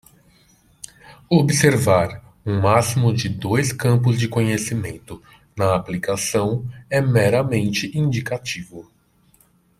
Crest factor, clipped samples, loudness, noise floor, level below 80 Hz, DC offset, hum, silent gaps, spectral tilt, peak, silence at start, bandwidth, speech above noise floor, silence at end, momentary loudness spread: 20 dB; under 0.1%; -20 LUFS; -57 dBFS; -52 dBFS; under 0.1%; none; none; -5.5 dB/octave; 0 dBFS; 1.1 s; 15 kHz; 38 dB; 0.95 s; 20 LU